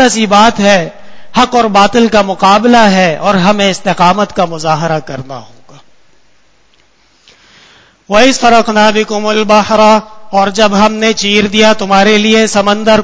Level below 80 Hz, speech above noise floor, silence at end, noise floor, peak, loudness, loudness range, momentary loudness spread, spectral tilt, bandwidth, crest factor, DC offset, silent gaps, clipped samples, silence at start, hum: -40 dBFS; 43 dB; 0 s; -51 dBFS; 0 dBFS; -8 LUFS; 9 LU; 7 LU; -4 dB/octave; 8 kHz; 10 dB; under 0.1%; none; 1%; 0 s; none